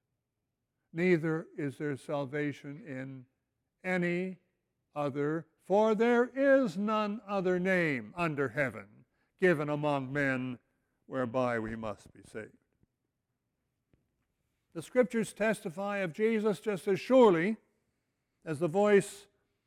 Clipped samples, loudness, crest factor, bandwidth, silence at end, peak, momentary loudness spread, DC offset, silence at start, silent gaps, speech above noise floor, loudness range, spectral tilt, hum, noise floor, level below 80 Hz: under 0.1%; -31 LUFS; 20 dB; 16 kHz; 0.45 s; -12 dBFS; 18 LU; under 0.1%; 0.95 s; none; 55 dB; 9 LU; -6.5 dB/octave; none; -86 dBFS; -70 dBFS